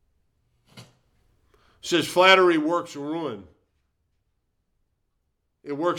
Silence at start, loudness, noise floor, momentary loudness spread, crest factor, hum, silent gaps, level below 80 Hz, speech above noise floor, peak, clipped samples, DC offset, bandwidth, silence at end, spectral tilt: 0.75 s; -21 LUFS; -75 dBFS; 20 LU; 24 dB; none; none; -68 dBFS; 53 dB; -2 dBFS; under 0.1%; under 0.1%; 17 kHz; 0 s; -3.5 dB/octave